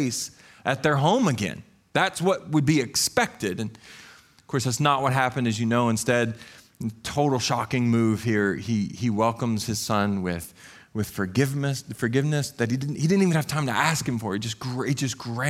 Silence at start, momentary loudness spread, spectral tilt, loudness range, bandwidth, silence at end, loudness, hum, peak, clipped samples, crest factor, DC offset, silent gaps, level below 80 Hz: 0 s; 10 LU; -5 dB/octave; 3 LU; 16 kHz; 0 s; -25 LUFS; none; -6 dBFS; under 0.1%; 18 dB; under 0.1%; none; -58 dBFS